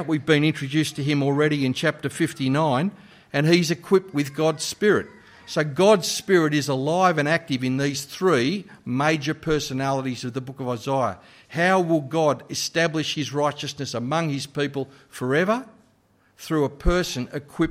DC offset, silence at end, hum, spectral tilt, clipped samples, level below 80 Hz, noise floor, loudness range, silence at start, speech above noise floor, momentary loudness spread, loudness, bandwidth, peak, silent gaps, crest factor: under 0.1%; 0 s; none; -5 dB/octave; under 0.1%; -44 dBFS; -61 dBFS; 5 LU; 0 s; 39 dB; 10 LU; -23 LUFS; 16 kHz; -6 dBFS; none; 18 dB